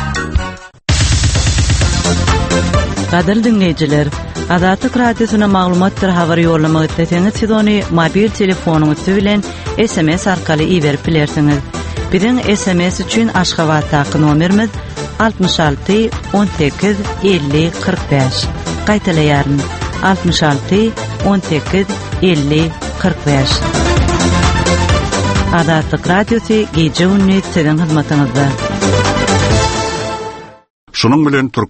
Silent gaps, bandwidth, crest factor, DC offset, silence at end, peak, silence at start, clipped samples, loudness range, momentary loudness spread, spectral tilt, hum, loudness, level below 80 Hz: 30.70-30.87 s; 8.8 kHz; 12 dB; under 0.1%; 0.05 s; 0 dBFS; 0 s; under 0.1%; 2 LU; 5 LU; -5.5 dB/octave; none; -13 LUFS; -24 dBFS